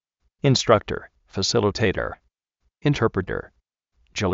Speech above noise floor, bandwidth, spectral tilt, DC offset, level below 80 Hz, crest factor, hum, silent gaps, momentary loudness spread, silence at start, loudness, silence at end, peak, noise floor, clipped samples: 51 dB; 8 kHz; -4.5 dB/octave; under 0.1%; -46 dBFS; 22 dB; none; none; 14 LU; 0.45 s; -23 LUFS; 0 s; -2 dBFS; -73 dBFS; under 0.1%